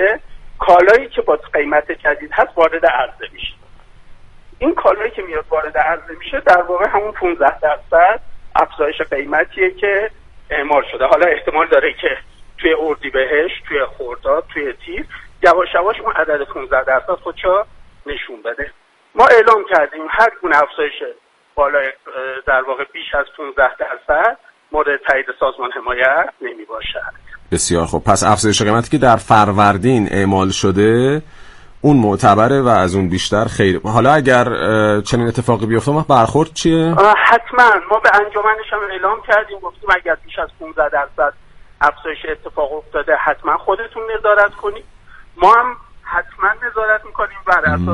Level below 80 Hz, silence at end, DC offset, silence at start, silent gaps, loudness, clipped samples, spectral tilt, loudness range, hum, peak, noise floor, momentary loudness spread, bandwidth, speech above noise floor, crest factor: -40 dBFS; 0 s; under 0.1%; 0 s; none; -15 LUFS; under 0.1%; -5 dB/octave; 6 LU; none; 0 dBFS; -41 dBFS; 13 LU; 11.5 kHz; 26 dB; 14 dB